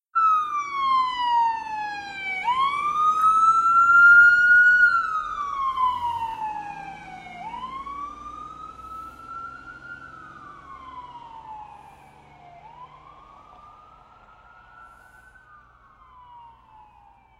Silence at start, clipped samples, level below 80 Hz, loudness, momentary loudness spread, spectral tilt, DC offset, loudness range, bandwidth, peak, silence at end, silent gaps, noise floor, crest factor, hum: 0.15 s; under 0.1%; -58 dBFS; -19 LUFS; 27 LU; -1.5 dB/octave; under 0.1%; 24 LU; 10.5 kHz; -6 dBFS; 1 s; none; -54 dBFS; 18 dB; none